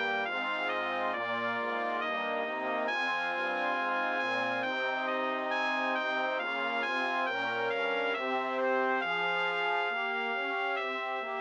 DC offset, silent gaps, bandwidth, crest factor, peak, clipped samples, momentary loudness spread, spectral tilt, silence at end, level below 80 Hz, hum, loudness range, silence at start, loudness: under 0.1%; none; 8.8 kHz; 14 dB; -18 dBFS; under 0.1%; 3 LU; -3.5 dB/octave; 0 s; -82 dBFS; none; 1 LU; 0 s; -31 LUFS